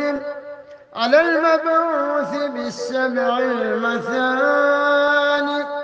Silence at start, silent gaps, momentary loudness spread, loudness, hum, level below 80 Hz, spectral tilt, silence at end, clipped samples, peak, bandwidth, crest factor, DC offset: 0 s; none; 10 LU; -18 LUFS; none; -66 dBFS; -4 dB/octave; 0 s; under 0.1%; -4 dBFS; 8 kHz; 16 dB; under 0.1%